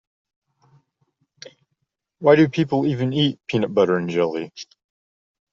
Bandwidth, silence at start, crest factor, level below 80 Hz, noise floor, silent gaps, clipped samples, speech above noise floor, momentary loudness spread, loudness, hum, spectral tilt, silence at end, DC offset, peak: 7.4 kHz; 1.45 s; 20 dB; -62 dBFS; -76 dBFS; none; under 0.1%; 57 dB; 16 LU; -20 LUFS; none; -5.5 dB/octave; 0.9 s; under 0.1%; -2 dBFS